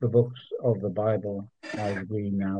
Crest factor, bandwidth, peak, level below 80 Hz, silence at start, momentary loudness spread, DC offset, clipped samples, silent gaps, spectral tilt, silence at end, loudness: 18 dB; 9 kHz; -10 dBFS; -66 dBFS; 0 s; 10 LU; under 0.1%; under 0.1%; none; -8.5 dB/octave; 0 s; -29 LUFS